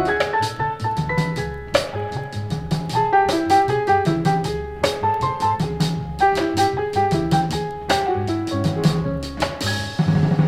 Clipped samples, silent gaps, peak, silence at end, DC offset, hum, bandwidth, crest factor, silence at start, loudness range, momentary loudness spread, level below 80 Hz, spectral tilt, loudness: under 0.1%; none; -2 dBFS; 0 s; under 0.1%; none; 15 kHz; 18 dB; 0 s; 2 LU; 8 LU; -40 dBFS; -6 dB/octave; -21 LUFS